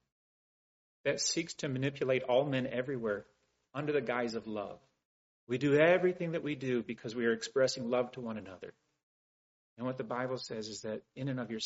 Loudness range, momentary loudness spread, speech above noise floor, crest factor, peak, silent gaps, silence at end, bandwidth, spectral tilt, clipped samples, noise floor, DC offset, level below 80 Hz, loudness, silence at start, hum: 8 LU; 12 LU; over 56 dB; 22 dB; -14 dBFS; 5.05-5.47 s, 9.03-9.76 s; 0 s; 8 kHz; -4.5 dB/octave; under 0.1%; under -90 dBFS; under 0.1%; -74 dBFS; -34 LUFS; 1.05 s; none